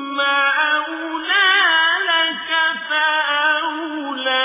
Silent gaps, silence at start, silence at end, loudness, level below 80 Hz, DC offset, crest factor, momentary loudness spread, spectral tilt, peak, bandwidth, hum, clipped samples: none; 0 s; 0 s; -16 LUFS; -72 dBFS; under 0.1%; 16 dB; 11 LU; -3.5 dB/octave; -2 dBFS; 3.9 kHz; none; under 0.1%